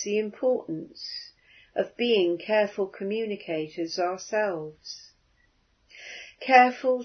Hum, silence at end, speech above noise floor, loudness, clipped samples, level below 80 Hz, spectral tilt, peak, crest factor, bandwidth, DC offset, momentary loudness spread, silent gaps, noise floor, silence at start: none; 0 s; 40 dB; -26 LUFS; under 0.1%; -72 dBFS; -4 dB/octave; -2 dBFS; 24 dB; 6.6 kHz; under 0.1%; 21 LU; none; -66 dBFS; 0 s